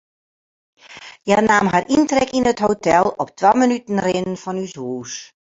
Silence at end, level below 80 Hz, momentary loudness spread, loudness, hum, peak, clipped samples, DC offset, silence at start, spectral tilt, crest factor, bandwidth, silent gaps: 0.3 s; -52 dBFS; 15 LU; -18 LUFS; none; 0 dBFS; under 0.1%; under 0.1%; 0.9 s; -5 dB/octave; 18 dB; 8 kHz; none